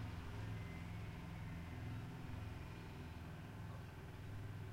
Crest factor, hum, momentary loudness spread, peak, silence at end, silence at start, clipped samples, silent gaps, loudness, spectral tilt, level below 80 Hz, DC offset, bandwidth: 12 dB; none; 4 LU; -36 dBFS; 0 s; 0 s; under 0.1%; none; -51 LUFS; -6.5 dB/octave; -58 dBFS; under 0.1%; 16 kHz